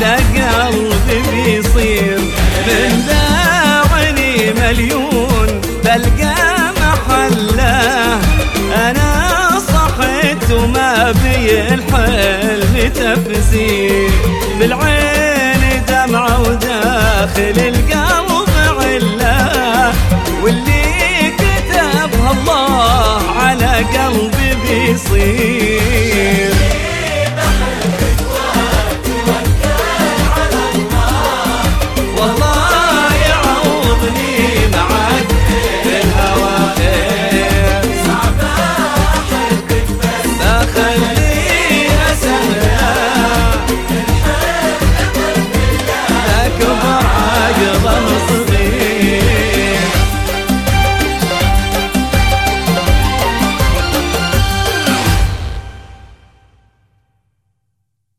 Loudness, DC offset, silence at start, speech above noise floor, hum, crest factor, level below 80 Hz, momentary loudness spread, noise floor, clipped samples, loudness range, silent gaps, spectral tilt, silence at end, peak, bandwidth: -12 LUFS; under 0.1%; 0 s; 56 dB; none; 12 dB; -18 dBFS; 3 LU; -68 dBFS; under 0.1%; 2 LU; none; -4.5 dB/octave; 2.05 s; 0 dBFS; 17.5 kHz